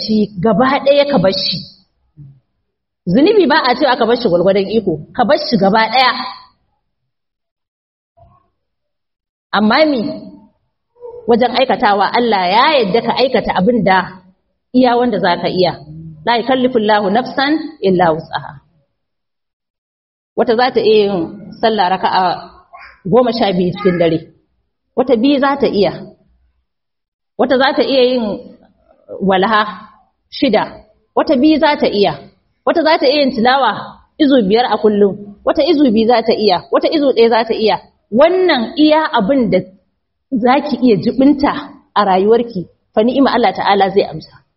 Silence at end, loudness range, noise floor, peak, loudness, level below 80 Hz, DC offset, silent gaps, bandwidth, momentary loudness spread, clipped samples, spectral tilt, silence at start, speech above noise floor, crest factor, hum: 0.3 s; 5 LU; -80 dBFS; 0 dBFS; -13 LUFS; -48 dBFS; under 0.1%; 7.51-7.56 s, 7.68-8.15 s, 9.29-9.50 s, 19.53-19.60 s, 19.70-20.36 s, 27.08-27.19 s; 6 kHz; 11 LU; under 0.1%; -3.5 dB/octave; 0 s; 67 dB; 14 dB; none